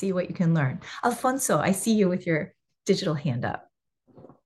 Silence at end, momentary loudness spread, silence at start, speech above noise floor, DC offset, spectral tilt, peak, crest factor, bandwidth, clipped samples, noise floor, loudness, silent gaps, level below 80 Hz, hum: 0.2 s; 9 LU; 0 s; 36 dB; under 0.1%; -5.5 dB/octave; -10 dBFS; 16 dB; 12.5 kHz; under 0.1%; -61 dBFS; -26 LUFS; none; -66 dBFS; none